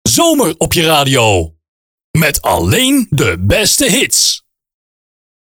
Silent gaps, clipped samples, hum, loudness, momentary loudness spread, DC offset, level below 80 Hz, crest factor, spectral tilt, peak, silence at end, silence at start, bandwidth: 1.68-1.98 s, 2.04-2.14 s; under 0.1%; none; -11 LUFS; 5 LU; under 0.1%; -34 dBFS; 12 dB; -3.5 dB/octave; 0 dBFS; 1.15 s; 0.05 s; over 20 kHz